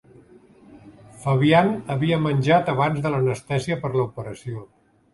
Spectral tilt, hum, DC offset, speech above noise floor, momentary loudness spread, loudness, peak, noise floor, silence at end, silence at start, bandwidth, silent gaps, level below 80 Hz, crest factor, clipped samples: -7 dB/octave; none; under 0.1%; 29 dB; 16 LU; -21 LUFS; -4 dBFS; -50 dBFS; 0.5 s; 0.7 s; 11.5 kHz; none; -54 dBFS; 20 dB; under 0.1%